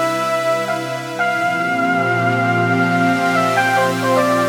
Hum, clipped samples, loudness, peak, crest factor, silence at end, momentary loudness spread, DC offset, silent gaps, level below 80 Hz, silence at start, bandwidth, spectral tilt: none; under 0.1%; -17 LUFS; -4 dBFS; 14 dB; 0 s; 4 LU; under 0.1%; none; -66 dBFS; 0 s; 19.5 kHz; -5.5 dB/octave